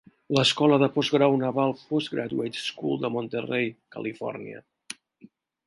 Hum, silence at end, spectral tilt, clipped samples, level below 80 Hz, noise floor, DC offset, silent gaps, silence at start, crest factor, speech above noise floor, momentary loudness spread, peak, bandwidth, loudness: none; 0.75 s; -5.5 dB/octave; under 0.1%; -70 dBFS; -55 dBFS; under 0.1%; none; 0.3 s; 20 dB; 30 dB; 21 LU; -6 dBFS; 11.5 kHz; -25 LUFS